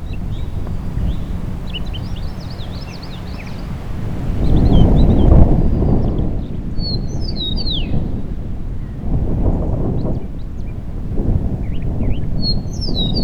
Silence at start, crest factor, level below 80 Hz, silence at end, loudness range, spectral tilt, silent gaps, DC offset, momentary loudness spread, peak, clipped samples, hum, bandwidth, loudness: 0 s; 16 dB; -20 dBFS; 0 s; 10 LU; -8 dB/octave; none; under 0.1%; 15 LU; 0 dBFS; under 0.1%; none; 6.8 kHz; -20 LUFS